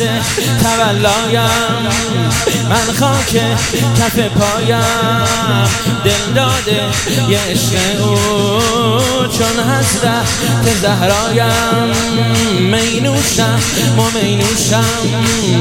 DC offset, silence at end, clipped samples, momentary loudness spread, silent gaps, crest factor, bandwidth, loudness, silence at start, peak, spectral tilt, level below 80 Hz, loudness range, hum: under 0.1%; 0 s; under 0.1%; 2 LU; none; 12 dB; 16.5 kHz; -12 LUFS; 0 s; 0 dBFS; -4 dB/octave; -34 dBFS; 1 LU; none